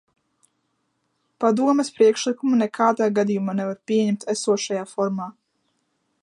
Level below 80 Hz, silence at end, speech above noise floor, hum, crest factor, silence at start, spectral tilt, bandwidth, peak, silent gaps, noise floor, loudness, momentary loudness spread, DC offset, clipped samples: -74 dBFS; 0.9 s; 51 dB; none; 18 dB; 1.4 s; -5 dB/octave; 11.5 kHz; -4 dBFS; none; -72 dBFS; -22 LUFS; 7 LU; under 0.1%; under 0.1%